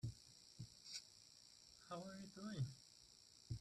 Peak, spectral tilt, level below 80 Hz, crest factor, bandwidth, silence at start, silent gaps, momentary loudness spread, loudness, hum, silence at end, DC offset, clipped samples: -36 dBFS; -5 dB/octave; -72 dBFS; 18 dB; 13.5 kHz; 0 s; none; 15 LU; -55 LUFS; none; 0 s; under 0.1%; under 0.1%